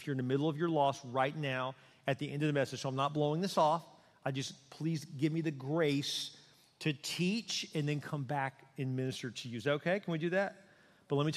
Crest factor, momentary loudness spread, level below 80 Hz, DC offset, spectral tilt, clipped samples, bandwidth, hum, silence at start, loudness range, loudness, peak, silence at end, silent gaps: 18 dB; 8 LU; -78 dBFS; under 0.1%; -5.5 dB/octave; under 0.1%; 14.5 kHz; none; 0 s; 3 LU; -35 LUFS; -18 dBFS; 0 s; none